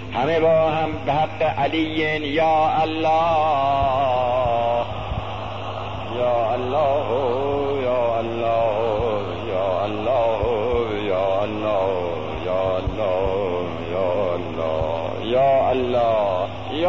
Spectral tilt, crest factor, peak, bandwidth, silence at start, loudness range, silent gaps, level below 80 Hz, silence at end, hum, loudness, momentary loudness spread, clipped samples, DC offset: -7 dB/octave; 12 dB; -8 dBFS; 7.4 kHz; 0 s; 3 LU; none; -42 dBFS; 0 s; none; -21 LUFS; 8 LU; under 0.1%; 1%